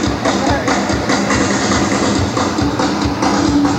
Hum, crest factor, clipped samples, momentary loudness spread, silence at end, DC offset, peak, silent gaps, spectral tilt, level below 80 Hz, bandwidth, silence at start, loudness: none; 14 dB; under 0.1%; 2 LU; 0 s; under 0.1%; -2 dBFS; none; -4.5 dB/octave; -32 dBFS; 15.5 kHz; 0 s; -15 LUFS